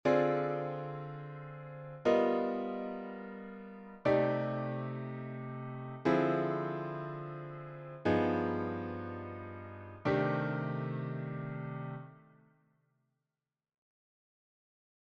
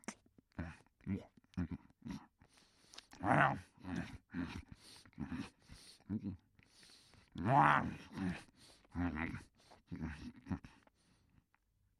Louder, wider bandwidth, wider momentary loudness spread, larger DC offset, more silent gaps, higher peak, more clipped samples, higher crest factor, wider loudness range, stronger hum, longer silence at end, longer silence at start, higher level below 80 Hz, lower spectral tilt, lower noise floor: first, -35 LUFS vs -40 LUFS; second, 7.6 kHz vs 12.5 kHz; second, 17 LU vs 25 LU; neither; neither; about the same, -16 dBFS vs -14 dBFS; neither; second, 20 dB vs 28 dB; about the same, 8 LU vs 10 LU; neither; first, 2.9 s vs 1.3 s; about the same, 0.05 s vs 0.1 s; second, -70 dBFS vs -62 dBFS; first, -8.5 dB/octave vs -6.5 dB/octave; first, under -90 dBFS vs -78 dBFS